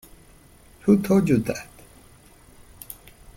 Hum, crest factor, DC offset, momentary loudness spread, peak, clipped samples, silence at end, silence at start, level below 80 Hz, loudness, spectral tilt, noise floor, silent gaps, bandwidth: none; 20 dB; under 0.1%; 24 LU; -6 dBFS; under 0.1%; 1.75 s; 0.85 s; -52 dBFS; -22 LUFS; -7.5 dB/octave; -51 dBFS; none; 16.5 kHz